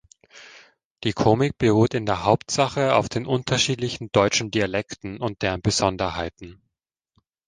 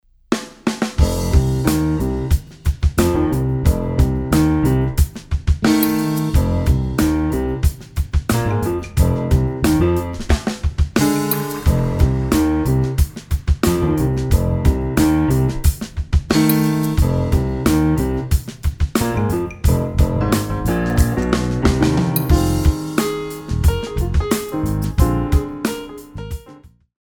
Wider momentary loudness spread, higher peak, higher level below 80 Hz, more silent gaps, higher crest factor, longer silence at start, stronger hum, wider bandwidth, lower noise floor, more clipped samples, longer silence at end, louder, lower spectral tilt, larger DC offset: first, 9 LU vs 6 LU; about the same, -2 dBFS vs 0 dBFS; second, -48 dBFS vs -22 dBFS; first, 0.85-0.95 s vs none; about the same, 20 dB vs 16 dB; about the same, 0.35 s vs 0.3 s; neither; second, 10 kHz vs over 20 kHz; first, -81 dBFS vs -44 dBFS; neither; first, 0.95 s vs 0.35 s; second, -22 LUFS vs -18 LUFS; second, -4.5 dB/octave vs -6.5 dB/octave; neither